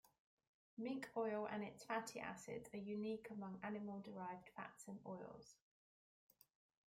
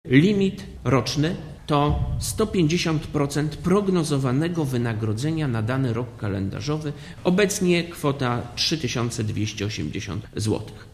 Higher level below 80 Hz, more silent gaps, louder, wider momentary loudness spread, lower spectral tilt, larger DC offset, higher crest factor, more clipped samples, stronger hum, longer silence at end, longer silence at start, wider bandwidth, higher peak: second, -86 dBFS vs -40 dBFS; first, 0.20-0.38 s, 0.47-0.77 s vs none; second, -50 LUFS vs -24 LUFS; first, 11 LU vs 7 LU; about the same, -5.5 dB/octave vs -5.5 dB/octave; neither; about the same, 20 dB vs 20 dB; neither; neither; first, 1.35 s vs 0.05 s; about the same, 0.05 s vs 0.05 s; about the same, 16 kHz vs 15 kHz; second, -30 dBFS vs -4 dBFS